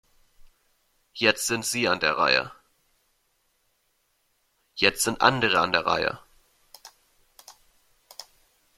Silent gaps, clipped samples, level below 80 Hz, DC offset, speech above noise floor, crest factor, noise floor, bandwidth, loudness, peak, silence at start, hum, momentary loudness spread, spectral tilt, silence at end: none; under 0.1%; -60 dBFS; under 0.1%; 47 dB; 26 dB; -71 dBFS; 16.5 kHz; -23 LUFS; -2 dBFS; 1.15 s; none; 23 LU; -2.5 dB/octave; 0.55 s